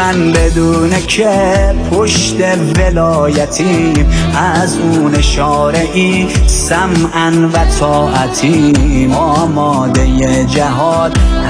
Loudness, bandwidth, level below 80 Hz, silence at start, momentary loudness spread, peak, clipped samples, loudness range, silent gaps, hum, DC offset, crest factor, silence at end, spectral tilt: -11 LUFS; 10.5 kHz; -16 dBFS; 0 s; 2 LU; 0 dBFS; under 0.1%; 0 LU; none; none; under 0.1%; 10 dB; 0 s; -5 dB/octave